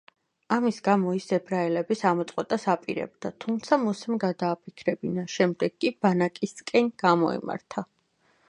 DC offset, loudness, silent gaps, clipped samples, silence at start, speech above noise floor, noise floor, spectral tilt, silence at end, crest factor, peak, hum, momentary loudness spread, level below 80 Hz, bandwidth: under 0.1%; -27 LUFS; none; under 0.1%; 0.5 s; 41 dB; -67 dBFS; -6 dB/octave; 0.65 s; 20 dB; -6 dBFS; none; 10 LU; -72 dBFS; 10.5 kHz